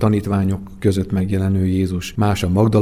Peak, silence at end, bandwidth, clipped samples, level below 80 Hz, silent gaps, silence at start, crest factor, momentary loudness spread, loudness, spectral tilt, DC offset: -2 dBFS; 0 s; 14.5 kHz; under 0.1%; -40 dBFS; none; 0 s; 14 dB; 4 LU; -19 LUFS; -7.5 dB/octave; under 0.1%